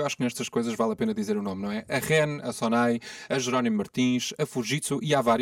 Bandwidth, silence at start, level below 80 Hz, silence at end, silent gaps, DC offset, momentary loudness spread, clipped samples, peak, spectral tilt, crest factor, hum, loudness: 16.5 kHz; 0 s; -64 dBFS; 0 s; none; under 0.1%; 6 LU; under 0.1%; -10 dBFS; -4.5 dB/octave; 16 dB; none; -27 LUFS